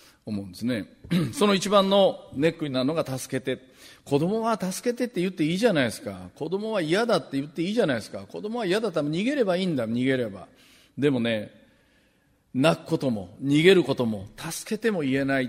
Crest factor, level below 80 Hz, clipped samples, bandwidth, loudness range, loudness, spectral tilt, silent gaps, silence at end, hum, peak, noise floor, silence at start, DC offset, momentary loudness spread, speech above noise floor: 22 dB; -62 dBFS; under 0.1%; 16 kHz; 3 LU; -25 LUFS; -5.5 dB/octave; none; 0 s; none; -4 dBFS; -65 dBFS; 0.25 s; under 0.1%; 13 LU; 40 dB